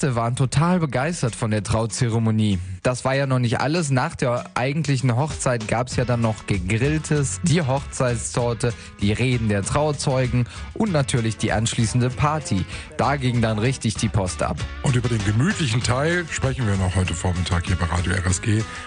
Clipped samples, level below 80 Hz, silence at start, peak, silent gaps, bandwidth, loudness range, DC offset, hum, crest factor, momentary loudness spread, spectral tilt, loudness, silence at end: under 0.1%; -40 dBFS; 0 s; -6 dBFS; none; 10 kHz; 1 LU; under 0.1%; none; 14 dB; 4 LU; -5.5 dB/octave; -22 LUFS; 0 s